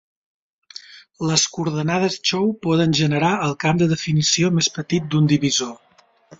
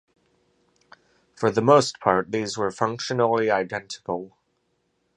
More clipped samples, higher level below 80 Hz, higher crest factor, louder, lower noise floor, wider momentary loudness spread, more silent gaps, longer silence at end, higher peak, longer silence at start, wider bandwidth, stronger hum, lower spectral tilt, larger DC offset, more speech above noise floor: neither; first, -56 dBFS vs -62 dBFS; about the same, 18 dB vs 22 dB; first, -19 LUFS vs -23 LUFS; second, -50 dBFS vs -71 dBFS; second, 10 LU vs 14 LU; neither; second, 0.65 s vs 0.9 s; about the same, -2 dBFS vs -2 dBFS; second, 0.9 s vs 1.4 s; second, 7.8 kHz vs 11 kHz; neither; about the same, -4.5 dB/octave vs -5 dB/octave; neither; second, 30 dB vs 49 dB